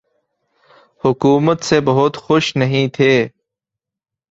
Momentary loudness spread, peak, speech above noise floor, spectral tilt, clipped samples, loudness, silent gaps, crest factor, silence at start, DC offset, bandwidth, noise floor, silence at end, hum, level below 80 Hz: 5 LU; -2 dBFS; 71 dB; -6 dB/octave; under 0.1%; -15 LUFS; none; 16 dB; 1.05 s; under 0.1%; 8 kHz; -85 dBFS; 1.05 s; none; -52 dBFS